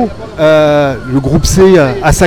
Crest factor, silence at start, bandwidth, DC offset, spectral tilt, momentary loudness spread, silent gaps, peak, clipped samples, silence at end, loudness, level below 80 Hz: 8 dB; 0 s; 19.5 kHz; under 0.1%; -5.5 dB/octave; 7 LU; none; 0 dBFS; 0.7%; 0 s; -9 LUFS; -22 dBFS